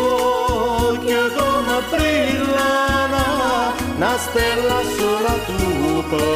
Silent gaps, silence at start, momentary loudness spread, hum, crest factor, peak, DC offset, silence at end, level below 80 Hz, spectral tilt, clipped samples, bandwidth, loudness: none; 0 s; 3 LU; none; 12 dB; -6 dBFS; 0.3%; 0 s; -32 dBFS; -4.5 dB/octave; under 0.1%; 15.5 kHz; -18 LUFS